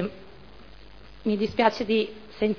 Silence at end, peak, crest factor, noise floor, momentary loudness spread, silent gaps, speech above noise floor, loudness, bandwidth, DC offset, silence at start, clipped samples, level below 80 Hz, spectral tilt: 0 s; -6 dBFS; 22 dB; -48 dBFS; 11 LU; none; 24 dB; -26 LUFS; 5.4 kHz; 0.4%; 0 s; under 0.1%; -52 dBFS; -6.5 dB/octave